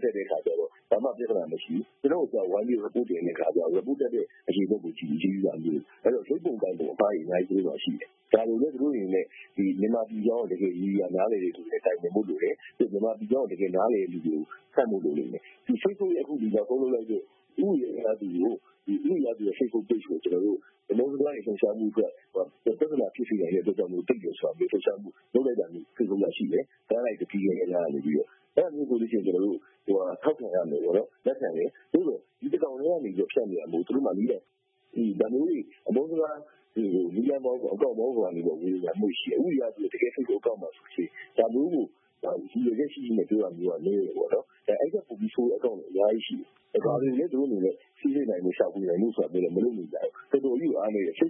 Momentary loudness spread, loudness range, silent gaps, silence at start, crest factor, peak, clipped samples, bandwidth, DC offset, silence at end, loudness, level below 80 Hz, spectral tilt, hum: 5 LU; 1 LU; none; 0 s; 24 dB; -4 dBFS; under 0.1%; 3.7 kHz; under 0.1%; 0 s; -29 LUFS; -82 dBFS; -10.5 dB/octave; none